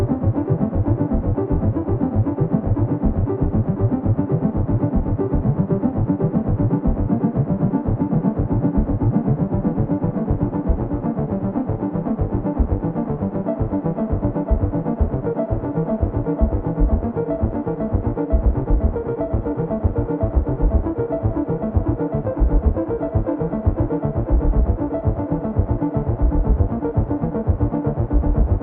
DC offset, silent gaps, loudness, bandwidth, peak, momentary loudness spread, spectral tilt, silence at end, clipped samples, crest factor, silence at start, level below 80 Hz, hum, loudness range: under 0.1%; none; -21 LUFS; 2.8 kHz; -4 dBFS; 3 LU; -14.5 dB/octave; 0 s; under 0.1%; 16 dB; 0 s; -24 dBFS; none; 2 LU